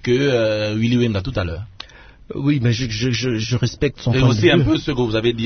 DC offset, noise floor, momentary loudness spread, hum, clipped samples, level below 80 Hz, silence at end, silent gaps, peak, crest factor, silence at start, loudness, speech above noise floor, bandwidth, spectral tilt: under 0.1%; -40 dBFS; 13 LU; none; under 0.1%; -38 dBFS; 0 s; none; 0 dBFS; 18 dB; 0.05 s; -18 LUFS; 22 dB; 6.6 kHz; -6 dB/octave